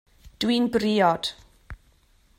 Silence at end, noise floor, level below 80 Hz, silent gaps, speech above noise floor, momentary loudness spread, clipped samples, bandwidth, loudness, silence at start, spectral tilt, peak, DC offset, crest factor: 0.65 s; -60 dBFS; -52 dBFS; none; 38 dB; 8 LU; under 0.1%; 16 kHz; -23 LUFS; 0.4 s; -5 dB/octave; -8 dBFS; under 0.1%; 18 dB